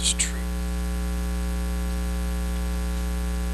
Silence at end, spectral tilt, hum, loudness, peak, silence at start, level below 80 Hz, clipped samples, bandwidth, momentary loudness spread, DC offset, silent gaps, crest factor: 0 s; -4 dB/octave; none; -28 LUFS; -10 dBFS; 0 s; -28 dBFS; under 0.1%; 13 kHz; 4 LU; under 0.1%; none; 16 dB